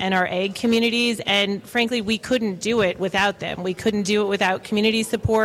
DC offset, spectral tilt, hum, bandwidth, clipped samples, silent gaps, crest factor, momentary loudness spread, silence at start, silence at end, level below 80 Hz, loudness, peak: under 0.1%; -4 dB/octave; none; 15.5 kHz; under 0.1%; none; 16 dB; 4 LU; 0 s; 0 s; -48 dBFS; -21 LUFS; -6 dBFS